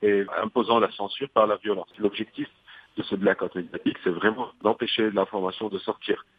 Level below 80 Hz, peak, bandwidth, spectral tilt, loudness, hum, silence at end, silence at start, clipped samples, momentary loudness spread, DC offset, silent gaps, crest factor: -68 dBFS; -4 dBFS; 5 kHz; -7.5 dB/octave; -26 LUFS; none; 0.15 s; 0 s; under 0.1%; 9 LU; under 0.1%; none; 20 dB